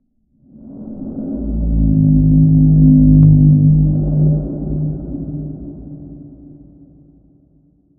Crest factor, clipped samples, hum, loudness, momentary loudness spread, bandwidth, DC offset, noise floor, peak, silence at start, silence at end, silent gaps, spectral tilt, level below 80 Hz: 14 dB; under 0.1%; none; -13 LUFS; 23 LU; 0.9 kHz; under 0.1%; -54 dBFS; 0 dBFS; 0.65 s; 1.7 s; none; -18 dB/octave; -24 dBFS